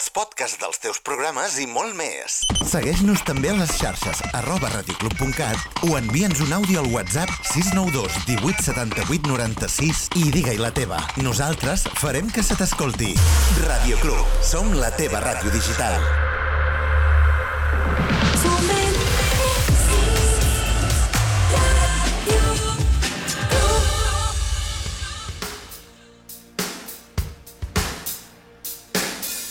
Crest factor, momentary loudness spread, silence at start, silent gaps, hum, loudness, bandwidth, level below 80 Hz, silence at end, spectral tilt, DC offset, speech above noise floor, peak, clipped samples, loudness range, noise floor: 14 dB; 10 LU; 0 s; none; none; -21 LUFS; 19 kHz; -24 dBFS; 0 s; -4 dB/octave; under 0.1%; 26 dB; -6 dBFS; under 0.1%; 8 LU; -47 dBFS